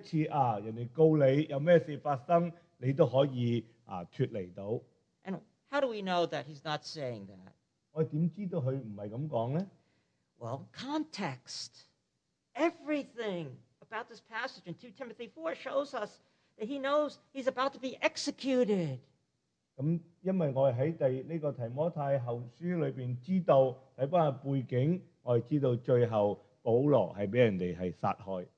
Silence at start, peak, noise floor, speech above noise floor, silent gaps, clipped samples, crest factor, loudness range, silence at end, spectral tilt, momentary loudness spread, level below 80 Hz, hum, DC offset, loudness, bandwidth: 0 s; -12 dBFS; -82 dBFS; 50 dB; none; under 0.1%; 20 dB; 9 LU; 0.1 s; -7 dB/octave; 15 LU; -76 dBFS; none; under 0.1%; -33 LUFS; 9.4 kHz